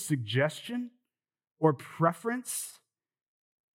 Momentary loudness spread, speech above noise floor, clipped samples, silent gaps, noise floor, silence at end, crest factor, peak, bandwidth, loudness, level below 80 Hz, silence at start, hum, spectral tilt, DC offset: 10 LU; over 60 dB; under 0.1%; 1.51-1.55 s; under -90 dBFS; 1.05 s; 22 dB; -10 dBFS; 17 kHz; -31 LUFS; under -90 dBFS; 0 s; none; -5 dB/octave; under 0.1%